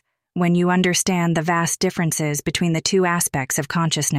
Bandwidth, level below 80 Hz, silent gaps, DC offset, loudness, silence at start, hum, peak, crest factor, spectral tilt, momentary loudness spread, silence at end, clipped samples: 16 kHz; -52 dBFS; none; under 0.1%; -20 LUFS; 0.35 s; none; -6 dBFS; 14 dB; -4 dB/octave; 5 LU; 0 s; under 0.1%